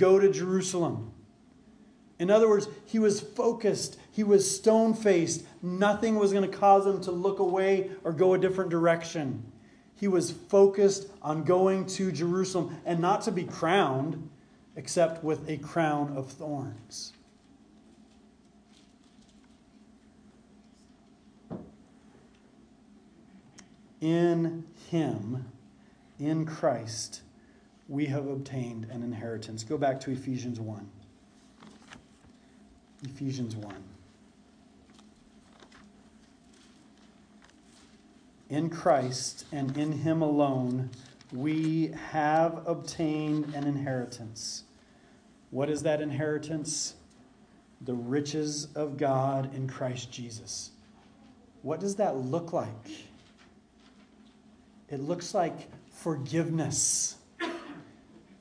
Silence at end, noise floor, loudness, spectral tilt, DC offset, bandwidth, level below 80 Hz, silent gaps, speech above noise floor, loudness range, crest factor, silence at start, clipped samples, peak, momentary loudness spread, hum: 0.55 s; -59 dBFS; -29 LUFS; -5 dB/octave; under 0.1%; 10.5 kHz; -68 dBFS; none; 31 dB; 15 LU; 22 dB; 0 s; under 0.1%; -10 dBFS; 16 LU; none